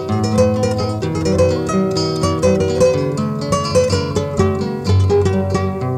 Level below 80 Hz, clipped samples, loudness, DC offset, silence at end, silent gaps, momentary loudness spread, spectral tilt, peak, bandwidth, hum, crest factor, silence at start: -38 dBFS; under 0.1%; -16 LUFS; under 0.1%; 0 s; none; 5 LU; -6.5 dB/octave; -2 dBFS; 13 kHz; none; 14 dB; 0 s